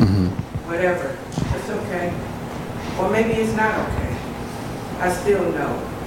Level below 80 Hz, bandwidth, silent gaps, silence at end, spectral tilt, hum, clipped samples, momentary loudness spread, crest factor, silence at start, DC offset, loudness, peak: -38 dBFS; 17 kHz; none; 0 s; -6.5 dB/octave; none; under 0.1%; 10 LU; 20 dB; 0 s; under 0.1%; -23 LUFS; -2 dBFS